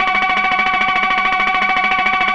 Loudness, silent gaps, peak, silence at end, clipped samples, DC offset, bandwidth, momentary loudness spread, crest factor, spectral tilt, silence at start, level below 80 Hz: -14 LUFS; none; -4 dBFS; 0 s; under 0.1%; 0.7%; 8.6 kHz; 0 LU; 12 dB; -3 dB/octave; 0 s; -44 dBFS